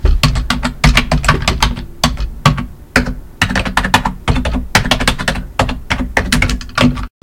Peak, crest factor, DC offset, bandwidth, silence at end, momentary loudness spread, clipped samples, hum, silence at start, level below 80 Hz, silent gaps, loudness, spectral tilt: 0 dBFS; 14 dB; under 0.1%; 17.5 kHz; 0.15 s; 6 LU; 0.3%; none; 0 s; -20 dBFS; none; -15 LUFS; -4 dB/octave